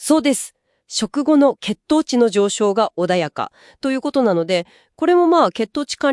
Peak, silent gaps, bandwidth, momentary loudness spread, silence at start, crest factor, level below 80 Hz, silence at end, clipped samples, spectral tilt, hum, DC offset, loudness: -2 dBFS; none; 12 kHz; 11 LU; 0 s; 16 dB; -60 dBFS; 0 s; under 0.1%; -4.5 dB/octave; none; under 0.1%; -18 LUFS